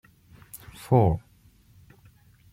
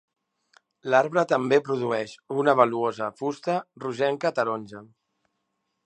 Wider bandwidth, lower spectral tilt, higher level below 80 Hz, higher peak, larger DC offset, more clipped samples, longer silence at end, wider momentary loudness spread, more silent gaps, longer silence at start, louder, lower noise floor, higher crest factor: first, 16.5 kHz vs 9.2 kHz; first, -8.5 dB/octave vs -6 dB/octave; first, -48 dBFS vs -76 dBFS; second, -8 dBFS vs -4 dBFS; neither; neither; first, 1.35 s vs 1 s; first, 23 LU vs 13 LU; neither; second, 0.55 s vs 0.85 s; about the same, -24 LUFS vs -25 LUFS; second, -58 dBFS vs -78 dBFS; about the same, 22 dB vs 22 dB